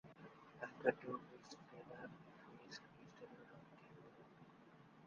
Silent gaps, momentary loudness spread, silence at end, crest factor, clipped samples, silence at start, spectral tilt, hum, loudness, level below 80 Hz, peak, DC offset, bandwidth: none; 22 LU; 0 s; 30 dB; under 0.1%; 0.05 s; -4 dB/octave; none; -49 LUFS; -86 dBFS; -20 dBFS; under 0.1%; 7.2 kHz